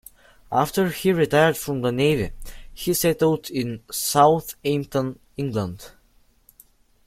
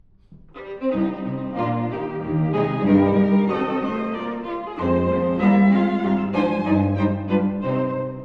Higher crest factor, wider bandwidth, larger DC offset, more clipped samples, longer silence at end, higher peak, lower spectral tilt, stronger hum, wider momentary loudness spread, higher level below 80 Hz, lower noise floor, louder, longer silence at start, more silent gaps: about the same, 20 dB vs 16 dB; first, 16.5 kHz vs 5 kHz; neither; neither; first, 1.15 s vs 0 s; first, -2 dBFS vs -6 dBFS; second, -5 dB/octave vs -10 dB/octave; neither; about the same, 13 LU vs 11 LU; about the same, -46 dBFS vs -50 dBFS; first, -59 dBFS vs -48 dBFS; about the same, -22 LUFS vs -21 LUFS; first, 0.5 s vs 0.3 s; neither